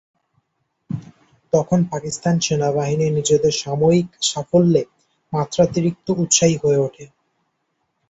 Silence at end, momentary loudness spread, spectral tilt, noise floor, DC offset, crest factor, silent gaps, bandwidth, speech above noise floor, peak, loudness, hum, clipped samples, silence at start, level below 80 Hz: 1.05 s; 11 LU; -5 dB/octave; -72 dBFS; under 0.1%; 18 dB; none; 8.2 kHz; 54 dB; -2 dBFS; -18 LUFS; none; under 0.1%; 0.9 s; -54 dBFS